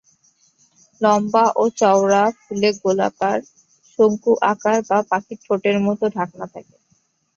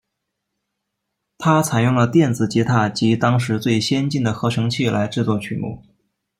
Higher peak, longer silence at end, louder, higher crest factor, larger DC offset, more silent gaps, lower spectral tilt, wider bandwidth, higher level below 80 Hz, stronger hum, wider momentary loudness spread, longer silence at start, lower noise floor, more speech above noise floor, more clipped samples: about the same, -2 dBFS vs -4 dBFS; first, 0.75 s vs 0.6 s; about the same, -18 LUFS vs -19 LUFS; about the same, 16 dB vs 16 dB; neither; neither; about the same, -5 dB/octave vs -6 dB/octave; second, 7.6 kHz vs 15 kHz; second, -64 dBFS vs -56 dBFS; neither; about the same, 9 LU vs 7 LU; second, 1 s vs 1.4 s; second, -64 dBFS vs -78 dBFS; second, 46 dB vs 60 dB; neither